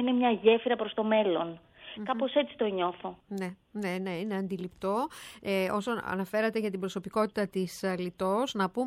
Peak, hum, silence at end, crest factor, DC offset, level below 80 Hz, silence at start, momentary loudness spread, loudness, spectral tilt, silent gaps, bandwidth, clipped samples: -10 dBFS; none; 0 s; 20 dB; under 0.1%; -68 dBFS; 0 s; 11 LU; -31 LUFS; -5.5 dB/octave; none; 16 kHz; under 0.1%